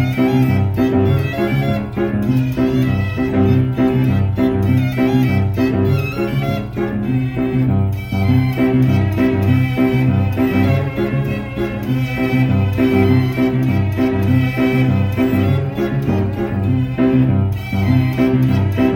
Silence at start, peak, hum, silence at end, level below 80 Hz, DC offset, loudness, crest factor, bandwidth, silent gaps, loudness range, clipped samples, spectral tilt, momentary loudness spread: 0 s; -2 dBFS; none; 0 s; -36 dBFS; under 0.1%; -16 LUFS; 12 dB; 17 kHz; none; 2 LU; under 0.1%; -8.5 dB/octave; 5 LU